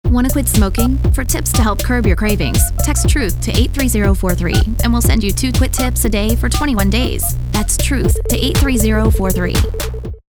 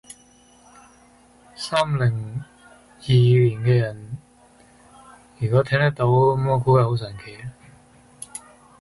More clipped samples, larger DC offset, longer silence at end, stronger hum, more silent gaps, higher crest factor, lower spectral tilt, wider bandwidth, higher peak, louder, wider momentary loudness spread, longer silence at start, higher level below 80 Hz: neither; neither; second, 0.1 s vs 0.45 s; neither; neither; about the same, 14 dB vs 16 dB; second, -5 dB/octave vs -7 dB/octave; first, over 20 kHz vs 11.5 kHz; first, 0 dBFS vs -6 dBFS; first, -15 LUFS vs -20 LUFS; second, 3 LU vs 20 LU; second, 0.05 s vs 1.6 s; first, -18 dBFS vs -52 dBFS